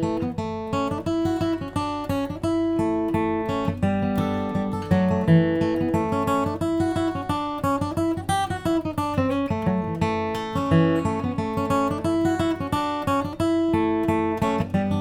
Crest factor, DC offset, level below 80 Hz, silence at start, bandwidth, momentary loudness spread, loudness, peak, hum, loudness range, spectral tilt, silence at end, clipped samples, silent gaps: 18 dB; under 0.1%; -46 dBFS; 0 s; 16 kHz; 5 LU; -24 LUFS; -6 dBFS; none; 2 LU; -7 dB/octave; 0 s; under 0.1%; none